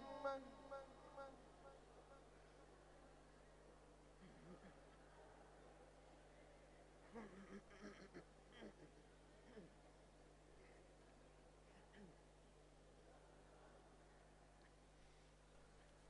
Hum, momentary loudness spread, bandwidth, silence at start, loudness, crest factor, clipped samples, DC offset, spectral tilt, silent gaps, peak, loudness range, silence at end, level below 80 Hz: 50 Hz at -70 dBFS; 10 LU; 10 kHz; 0 s; -63 LUFS; 28 dB; under 0.1%; under 0.1%; -5 dB/octave; none; -34 dBFS; 6 LU; 0 s; -72 dBFS